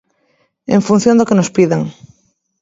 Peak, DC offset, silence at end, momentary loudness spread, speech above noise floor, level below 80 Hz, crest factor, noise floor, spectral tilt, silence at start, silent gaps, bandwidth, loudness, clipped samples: 0 dBFS; under 0.1%; 0.7 s; 12 LU; 48 dB; -54 dBFS; 14 dB; -60 dBFS; -6.5 dB/octave; 0.7 s; none; 8 kHz; -13 LUFS; under 0.1%